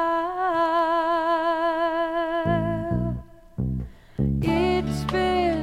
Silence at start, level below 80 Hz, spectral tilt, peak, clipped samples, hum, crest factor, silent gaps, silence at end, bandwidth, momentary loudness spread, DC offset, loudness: 0 s; -38 dBFS; -7 dB/octave; -10 dBFS; under 0.1%; 60 Hz at -50 dBFS; 14 dB; none; 0 s; 14.5 kHz; 9 LU; under 0.1%; -24 LUFS